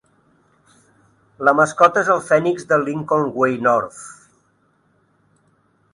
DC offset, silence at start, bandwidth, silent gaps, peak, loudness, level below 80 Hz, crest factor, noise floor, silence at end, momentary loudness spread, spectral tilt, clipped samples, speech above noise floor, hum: under 0.1%; 1.4 s; 11.5 kHz; none; 0 dBFS; -17 LUFS; -64 dBFS; 20 dB; -61 dBFS; 1.8 s; 8 LU; -5.5 dB/octave; under 0.1%; 44 dB; none